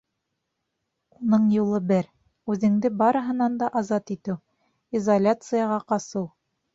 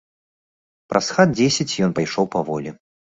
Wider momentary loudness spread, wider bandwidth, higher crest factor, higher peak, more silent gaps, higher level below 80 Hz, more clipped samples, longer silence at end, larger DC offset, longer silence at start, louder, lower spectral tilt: about the same, 11 LU vs 11 LU; about the same, 7.8 kHz vs 8.2 kHz; about the same, 18 dB vs 20 dB; second, -8 dBFS vs -2 dBFS; neither; second, -66 dBFS vs -56 dBFS; neither; about the same, 0.45 s vs 0.4 s; neither; first, 1.2 s vs 0.9 s; second, -24 LUFS vs -20 LUFS; first, -7.5 dB/octave vs -4.5 dB/octave